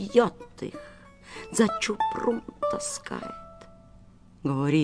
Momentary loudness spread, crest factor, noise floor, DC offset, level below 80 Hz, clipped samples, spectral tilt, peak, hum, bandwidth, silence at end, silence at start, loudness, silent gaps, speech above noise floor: 20 LU; 22 dB; -52 dBFS; under 0.1%; -56 dBFS; under 0.1%; -5 dB/octave; -6 dBFS; none; 11 kHz; 0 s; 0 s; -28 LUFS; none; 25 dB